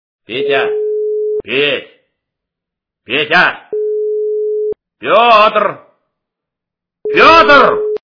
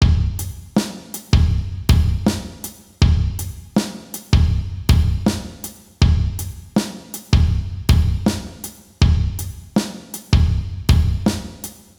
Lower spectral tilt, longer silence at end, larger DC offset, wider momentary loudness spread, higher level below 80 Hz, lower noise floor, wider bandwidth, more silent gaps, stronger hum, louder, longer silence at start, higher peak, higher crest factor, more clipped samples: second, -4.5 dB/octave vs -6 dB/octave; second, 0.05 s vs 0.25 s; neither; about the same, 14 LU vs 15 LU; second, -46 dBFS vs -22 dBFS; first, -82 dBFS vs -37 dBFS; second, 5.4 kHz vs over 20 kHz; neither; neither; first, -11 LUFS vs -20 LUFS; first, 0.3 s vs 0 s; about the same, 0 dBFS vs 0 dBFS; about the same, 14 dB vs 18 dB; first, 0.6% vs under 0.1%